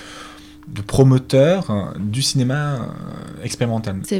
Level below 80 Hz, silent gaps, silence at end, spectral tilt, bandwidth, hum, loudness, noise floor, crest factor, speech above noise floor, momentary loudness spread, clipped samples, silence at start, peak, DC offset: -44 dBFS; none; 0 s; -6 dB/octave; 14.5 kHz; none; -18 LUFS; -39 dBFS; 16 dB; 21 dB; 19 LU; under 0.1%; 0 s; -2 dBFS; under 0.1%